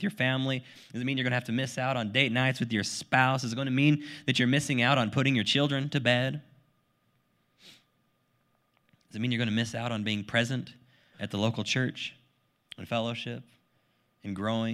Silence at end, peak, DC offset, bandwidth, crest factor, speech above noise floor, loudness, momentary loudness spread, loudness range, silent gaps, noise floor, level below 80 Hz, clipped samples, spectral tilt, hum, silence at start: 0 s; -6 dBFS; under 0.1%; 13 kHz; 24 dB; 43 dB; -28 LUFS; 14 LU; 8 LU; none; -72 dBFS; -70 dBFS; under 0.1%; -5 dB/octave; none; 0 s